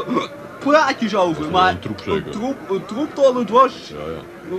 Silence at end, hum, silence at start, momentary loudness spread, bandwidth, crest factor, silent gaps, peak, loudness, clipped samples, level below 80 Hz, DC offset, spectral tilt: 0 s; none; 0 s; 15 LU; 13.5 kHz; 18 dB; none; 0 dBFS; -18 LUFS; under 0.1%; -50 dBFS; under 0.1%; -5.5 dB/octave